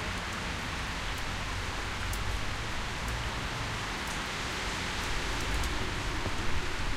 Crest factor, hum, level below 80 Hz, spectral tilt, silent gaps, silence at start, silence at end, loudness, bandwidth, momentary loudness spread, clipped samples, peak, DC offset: 14 dB; none; -38 dBFS; -3.5 dB/octave; none; 0 s; 0 s; -34 LUFS; 16 kHz; 2 LU; under 0.1%; -18 dBFS; under 0.1%